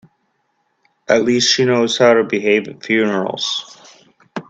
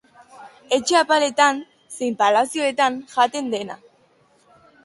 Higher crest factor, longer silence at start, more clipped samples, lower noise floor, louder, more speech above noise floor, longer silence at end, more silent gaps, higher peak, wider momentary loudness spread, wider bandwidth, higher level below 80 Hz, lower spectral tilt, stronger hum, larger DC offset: about the same, 18 dB vs 20 dB; first, 1.1 s vs 0.4 s; neither; first, -66 dBFS vs -58 dBFS; first, -15 LUFS vs -20 LUFS; first, 51 dB vs 39 dB; second, 0.1 s vs 1.1 s; neither; about the same, 0 dBFS vs -2 dBFS; second, 8 LU vs 13 LU; second, 8.6 kHz vs 12 kHz; first, -60 dBFS vs -70 dBFS; first, -3.5 dB/octave vs -2 dB/octave; neither; neither